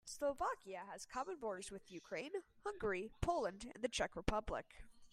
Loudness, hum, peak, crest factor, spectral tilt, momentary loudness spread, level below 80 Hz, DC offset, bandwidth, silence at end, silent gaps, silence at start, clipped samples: -44 LUFS; none; -20 dBFS; 24 dB; -4 dB/octave; 10 LU; -56 dBFS; under 0.1%; 15.5 kHz; 0.05 s; none; 0.05 s; under 0.1%